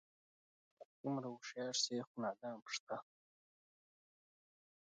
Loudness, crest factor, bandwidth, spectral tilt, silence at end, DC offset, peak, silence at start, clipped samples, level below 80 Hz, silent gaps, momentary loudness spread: -44 LUFS; 22 dB; 9 kHz; -3 dB/octave; 1.85 s; under 0.1%; -26 dBFS; 0.8 s; under 0.1%; under -90 dBFS; 0.85-1.04 s, 2.07-2.15 s, 2.62-2.66 s, 2.80-2.87 s; 11 LU